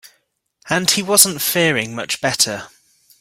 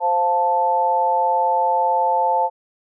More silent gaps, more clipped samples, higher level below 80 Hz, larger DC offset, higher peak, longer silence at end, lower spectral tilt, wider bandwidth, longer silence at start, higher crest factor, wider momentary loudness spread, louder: neither; neither; first, -58 dBFS vs under -90 dBFS; neither; first, 0 dBFS vs -10 dBFS; about the same, 0.55 s vs 0.5 s; second, -2 dB/octave vs -4.5 dB/octave; first, 17 kHz vs 1 kHz; first, 0.65 s vs 0 s; first, 20 dB vs 8 dB; first, 10 LU vs 1 LU; first, -15 LUFS vs -19 LUFS